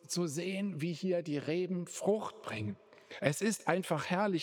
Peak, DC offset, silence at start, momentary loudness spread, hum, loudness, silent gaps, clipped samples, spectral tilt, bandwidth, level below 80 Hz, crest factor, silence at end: -12 dBFS; under 0.1%; 0.05 s; 8 LU; none; -35 LUFS; none; under 0.1%; -5 dB/octave; 19.5 kHz; -80 dBFS; 22 dB; 0 s